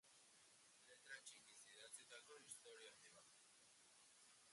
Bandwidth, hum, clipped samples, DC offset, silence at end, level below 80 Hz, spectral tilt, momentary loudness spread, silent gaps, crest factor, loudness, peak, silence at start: 11.5 kHz; none; under 0.1%; under 0.1%; 0 s; under -90 dBFS; 0.5 dB/octave; 10 LU; none; 22 dB; -63 LUFS; -44 dBFS; 0.05 s